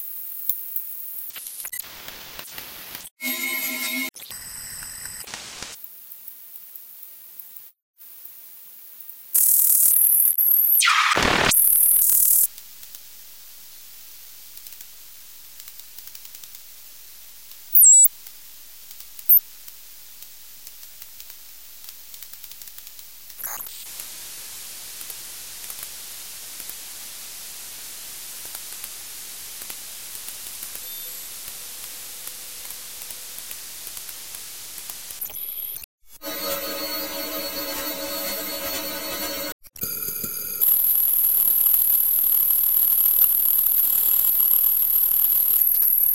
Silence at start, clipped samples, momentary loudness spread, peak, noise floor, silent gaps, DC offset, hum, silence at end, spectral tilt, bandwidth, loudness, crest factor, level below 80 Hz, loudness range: 0 s; under 0.1%; 25 LU; 0 dBFS; -44 dBFS; 3.11-3.16 s, 7.82-7.94 s, 35.84-35.98 s, 39.52-39.59 s; 0.5%; none; 0 s; 0.5 dB/octave; 17.5 kHz; -17 LUFS; 24 dB; -56 dBFS; 22 LU